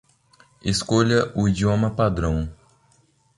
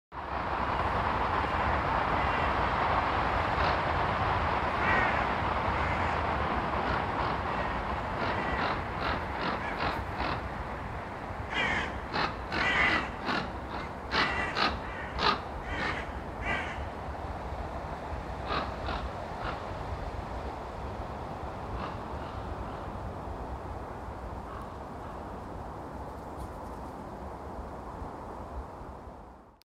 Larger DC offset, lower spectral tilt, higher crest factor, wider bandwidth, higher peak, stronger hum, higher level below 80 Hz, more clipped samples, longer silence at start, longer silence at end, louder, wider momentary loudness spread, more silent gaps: neither; about the same, -6 dB/octave vs -5.5 dB/octave; about the same, 18 dB vs 20 dB; second, 11.5 kHz vs 13.5 kHz; first, -4 dBFS vs -12 dBFS; neither; about the same, -38 dBFS vs -42 dBFS; neither; first, 0.65 s vs 0.1 s; first, 0.85 s vs 0.15 s; first, -22 LUFS vs -32 LUFS; second, 9 LU vs 13 LU; neither